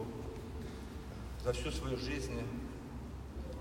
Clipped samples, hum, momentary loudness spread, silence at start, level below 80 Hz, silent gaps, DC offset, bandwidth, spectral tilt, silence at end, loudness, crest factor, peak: under 0.1%; none; 9 LU; 0 s; -46 dBFS; none; under 0.1%; 16 kHz; -5.5 dB/octave; 0 s; -42 LUFS; 18 dB; -22 dBFS